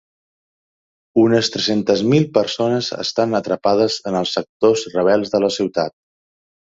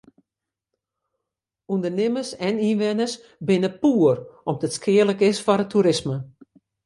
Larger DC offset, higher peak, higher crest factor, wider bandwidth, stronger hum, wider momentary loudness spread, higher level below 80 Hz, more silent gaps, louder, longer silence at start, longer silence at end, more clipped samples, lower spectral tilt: neither; first, 0 dBFS vs -4 dBFS; about the same, 18 dB vs 18 dB; second, 7.8 kHz vs 11.5 kHz; neither; second, 6 LU vs 10 LU; about the same, -58 dBFS vs -62 dBFS; first, 4.49-4.60 s vs none; first, -18 LUFS vs -22 LUFS; second, 1.15 s vs 1.7 s; first, 0.85 s vs 0.55 s; neither; about the same, -5 dB/octave vs -6 dB/octave